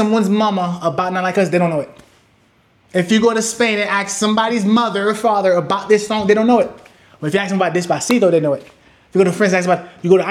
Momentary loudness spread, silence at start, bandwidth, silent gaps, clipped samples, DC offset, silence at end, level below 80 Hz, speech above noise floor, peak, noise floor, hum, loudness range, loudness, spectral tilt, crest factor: 6 LU; 0 s; 14 kHz; none; under 0.1%; under 0.1%; 0 s; -60 dBFS; 40 dB; 0 dBFS; -55 dBFS; none; 3 LU; -16 LUFS; -5 dB/octave; 16 dB